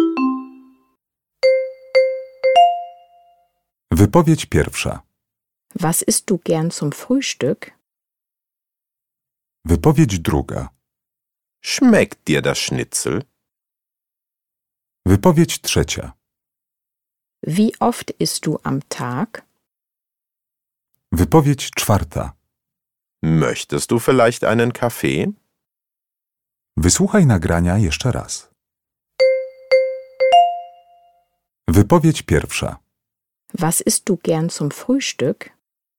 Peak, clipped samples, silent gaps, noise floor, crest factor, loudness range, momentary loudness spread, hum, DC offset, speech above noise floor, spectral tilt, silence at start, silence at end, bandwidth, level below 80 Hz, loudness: 0 dBFS; under 0.1%; none; -87 dBFS; 20 dB; 5 LU; 14 LU; none; under 0.1%; 70 dB; -5 dB/octave; 0 s; 0.5 s; 18 kHz; -38 dBFS; -18 LUFS